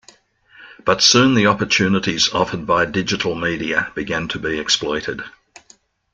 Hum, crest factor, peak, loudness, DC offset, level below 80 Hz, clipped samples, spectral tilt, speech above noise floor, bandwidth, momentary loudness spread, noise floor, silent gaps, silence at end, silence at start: none; 18 dB; 0 dBFS; -17 LUFS; under 0.1%; -48 dBFS; under 0.1%; -3.5 dB/octave; 35 dB; 11 kHz; 11 LU; -53 dBFS; none; 0.85 s; 0.6 s